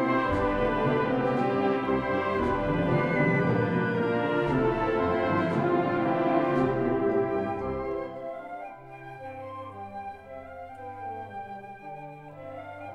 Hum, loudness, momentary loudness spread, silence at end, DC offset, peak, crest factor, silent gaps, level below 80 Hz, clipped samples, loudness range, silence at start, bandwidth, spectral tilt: none; -27 LUFS; 17 LU; 0 s; under 0.1%; -12 dBFS; 16 dB; none; -48 dBFS; under 0.1%; 14 LU; 0 s; 9.4 kHz; -8.5 dB/octave